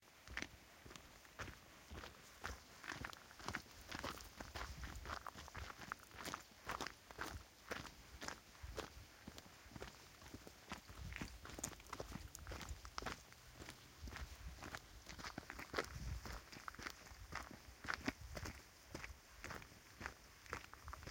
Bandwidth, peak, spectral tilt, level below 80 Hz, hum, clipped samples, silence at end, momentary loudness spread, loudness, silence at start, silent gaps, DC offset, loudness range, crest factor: 16.5 kHz; -24 dBFS; -3.5 dB/octave; -60 dBFS; none; under 0.1%; 0 s; 9 LU; -52 LUFS; 0 s; none; under 0.1%; 3 LU; 30 dB